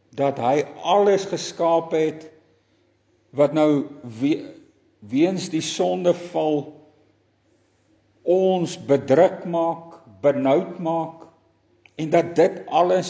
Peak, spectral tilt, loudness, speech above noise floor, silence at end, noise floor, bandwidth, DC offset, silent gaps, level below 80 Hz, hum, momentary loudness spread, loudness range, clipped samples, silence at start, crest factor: -4 dBFS; -6 dB/octave; -21 LUFS; 43 dB; 0 s; -63 dBFS; 8 kHz; under 0.1%; none; -70 dBFS; none; 11 LU; 4 LU; under 0.1%; 0.15 s; 18 dB